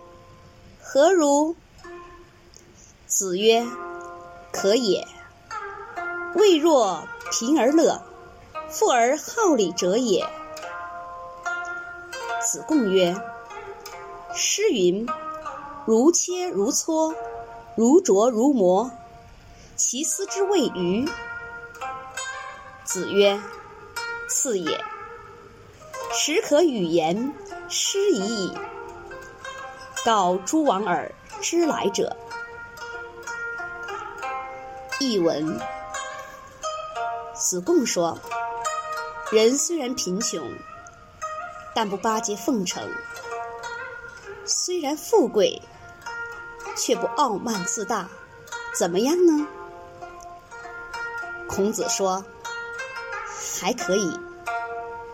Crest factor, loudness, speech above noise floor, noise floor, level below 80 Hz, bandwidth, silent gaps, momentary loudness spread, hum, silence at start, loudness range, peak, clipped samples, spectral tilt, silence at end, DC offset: 20 dB; -24 LUFS; 29 dB; -50 dBFS; -58 dBFS; 16.5 kHz; none; 19 LU; none; 0 s; 6 LU; -4 dBFS; under 0.1%; -3 dB/octave; 0 s; under 0.1%